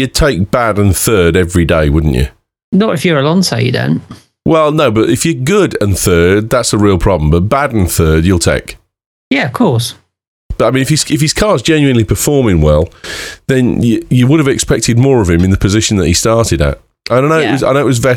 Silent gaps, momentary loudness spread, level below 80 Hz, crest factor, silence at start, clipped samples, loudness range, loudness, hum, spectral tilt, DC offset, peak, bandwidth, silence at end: 2.64-2.72 s, 9.06-9.31 s, 10.28-10.49 s; 6 LU; -24 dBFS; 10 dB; 0 s; under 0.1%; 2 LU; -11 LUFS; none; -5.5 dB/octave; under 0.1%; 0 dBFS; 18.5 kHz; 0 s